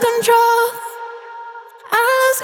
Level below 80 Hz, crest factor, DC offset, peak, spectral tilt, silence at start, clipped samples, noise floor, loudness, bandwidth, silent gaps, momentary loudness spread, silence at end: -74 dBFS; 14 dB; under 0.1%; -2 dBFS; -1 dB/octave; 0 s; under 0.1%; -36 dBFS; -15 LUFS; 19.5 kHz; none; 21 LU; 0 s